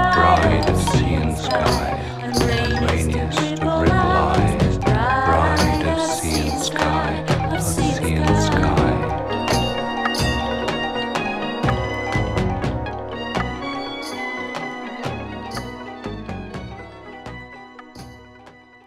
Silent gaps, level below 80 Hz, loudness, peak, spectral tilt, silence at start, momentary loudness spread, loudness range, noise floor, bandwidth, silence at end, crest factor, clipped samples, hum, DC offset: none; -30 dBFS; -20 LUFS; -2 dBFS; -5.5 dB/octave; 0 s; 15 LU; 12 LU; -46 dBFS; 15.5 kHz; 0.35 s; 18 dB; under 0.1%; none; under 0.1%